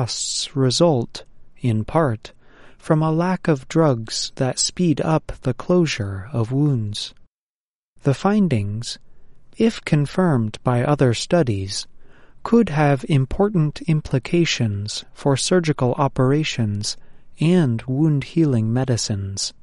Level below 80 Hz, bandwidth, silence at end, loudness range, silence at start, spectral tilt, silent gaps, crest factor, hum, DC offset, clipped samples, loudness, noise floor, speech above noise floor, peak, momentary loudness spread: -44 dBFS; 11.5 kHz; 0.1 s; 3 LU; 0 s; -5.5 dB/octave; 7.28-7.96 s; 16 dB; none; under 0.1%; under 0.1%; -20 LUFS; under -90 dBFS; over 71 dB; -4 dBFS; 9 LU